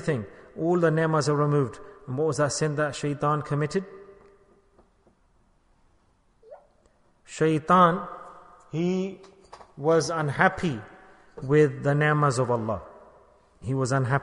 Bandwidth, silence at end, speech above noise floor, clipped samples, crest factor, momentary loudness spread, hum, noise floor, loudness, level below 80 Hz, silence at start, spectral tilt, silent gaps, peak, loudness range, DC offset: 10.5 kHz; 0 s; 40 dB; under 0.1%; 22 dB; 15 LU; none; -64 dBFS; -25 LUFS; -58 dBFS; 0 s; -6 dB/octave; none; -4 dBFS; 8 LU; under 0.1%